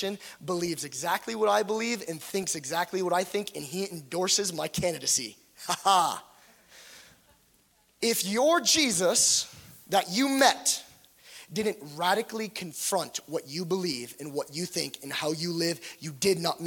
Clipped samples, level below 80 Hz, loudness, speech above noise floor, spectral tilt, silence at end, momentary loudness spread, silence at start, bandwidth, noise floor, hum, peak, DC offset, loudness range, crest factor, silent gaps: under 0.1%; -68 dBFS; -27 LUFS; 37 dB; -2.5 dB/octave; 0 s; 13 LU; 0 s; 17.5 kHz; -65 dBFS; none; -6 dBFS; under 0.1%; 7 LU; 24 dB; none